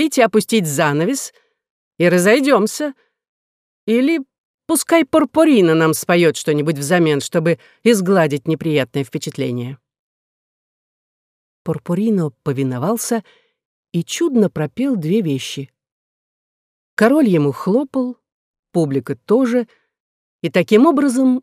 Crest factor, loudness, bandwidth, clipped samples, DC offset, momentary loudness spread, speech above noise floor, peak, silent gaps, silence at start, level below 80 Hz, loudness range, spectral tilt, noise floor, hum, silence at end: 16 dB; -17 LUFS; 16 kHz; under 0.1%; under 0.1%; 12 LU; over 74 dB; -2 dBFS; 1.70-1.91 s, 3.29-3.87 s, 4.38-4.58 s, 9.99-11.65 s, 13.65-13.83 s, 15.92-16.97 s, 18.32-18.63 s, 20.00-20.39 s; 0 s; -64 dBFS; 8 LU; -5.5 dB/octave; under -90 dBFS; none; 0 s